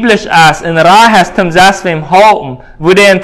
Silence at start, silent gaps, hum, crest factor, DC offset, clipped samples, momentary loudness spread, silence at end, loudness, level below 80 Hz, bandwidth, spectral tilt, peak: 0 s; none; none; 6 dB; under 0.1%; 7%; 10 LU; 0 s; -6 LUFS; -38 dBFS; 16 kHz; -4 dB/octave; 0 dBFS